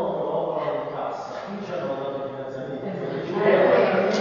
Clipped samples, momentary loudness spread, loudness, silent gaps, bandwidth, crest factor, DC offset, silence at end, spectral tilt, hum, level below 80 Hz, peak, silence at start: under 0.1%; 14 LU; -25 LUFS; none; 7.2 kHz; 18 dB; under 0.1%; 0 s; -6.5 dB/octave; none; -66 dBFS; -6 dBFS; 0 s